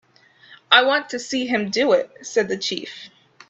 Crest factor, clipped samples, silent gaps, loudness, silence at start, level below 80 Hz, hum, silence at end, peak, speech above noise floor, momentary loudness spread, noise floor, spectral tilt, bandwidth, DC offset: 22 dB; under 0.1%; none; -20 LUFS; 0.5 s; -68 dBFS; none; 0.45 s; 0 dBFS; 31 dB; 13 LU; -52 dBFS; -2.5 dB/octave; 8.2 kHz; under 0.1%